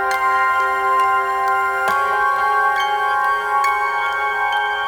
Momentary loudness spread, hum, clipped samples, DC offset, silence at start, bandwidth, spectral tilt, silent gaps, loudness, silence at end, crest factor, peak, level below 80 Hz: 2 LU; none; under 0.1%; under 0.1%; 0 s; over 20 kHz; -1.5 dB/octave; none; -17 LUFS; 0 s; 12 dB; -6 dBFS; -54 dBFS